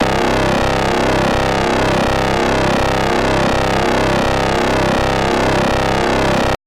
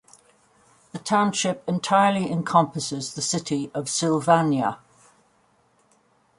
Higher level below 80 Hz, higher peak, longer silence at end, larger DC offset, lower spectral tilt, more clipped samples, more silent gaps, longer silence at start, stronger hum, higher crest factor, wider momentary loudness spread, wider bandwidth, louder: first, -26 dBFS vs -66 dBFS; about the same, -4 dBFS vs -4 dBFS; second, 0.1 s vs 1.65 s; neither; about the same, -5 dB/octave vs -4.5 dB/octave; neither; neither; second, 0 s vs 0.95 s; neither; second, 10 dB vs 22 dB; second, 1 LU vs 9 LU; first, 16 kHz vs 11.5 kHz; first, -15 LUFS vs -23 LUFS